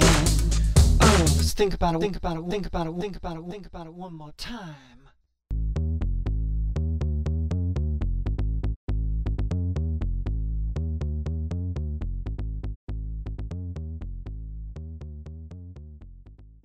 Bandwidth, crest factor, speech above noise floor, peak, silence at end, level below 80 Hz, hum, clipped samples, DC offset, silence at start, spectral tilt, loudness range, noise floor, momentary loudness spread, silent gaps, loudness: 16 kHz; 22 dB; 30 dB; -4 dBFS; 0.2 s; -28 dBFS; none; under 0.1%; under 0.1%; 0 s; -5 dB/octave; 13 LU; -59 dBFS; 18 LU; 8.76-8.87 s, 12.76-12.87 s; -27 LUFS